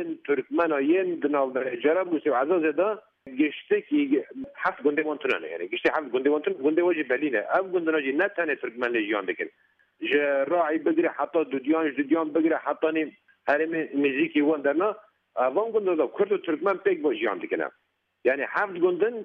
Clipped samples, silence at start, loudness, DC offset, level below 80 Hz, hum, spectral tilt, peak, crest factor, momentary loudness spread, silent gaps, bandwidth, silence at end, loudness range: under 0.1%; 0 s; -26 LUFS; under 0.1%; -76 dBFS; none; -7 dB/octave; -10 dBFS; 16 dB; 6 LU; none; 5 kHz; 0 s; 1 LU